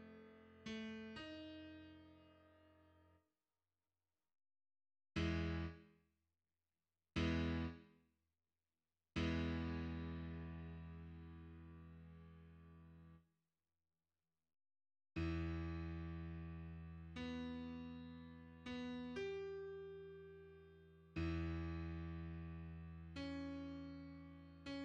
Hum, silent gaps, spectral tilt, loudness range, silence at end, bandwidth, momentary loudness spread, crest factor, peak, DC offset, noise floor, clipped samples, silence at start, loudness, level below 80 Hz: none; none; -7 dB/octave; 14 LU; 0 s; 8 kHz; 19 LU; 22 dB; -28 dBFS; under 0.1%; under -90 dBFS; under 0.1%; 0 s; -48 LUFS; -58 dBFS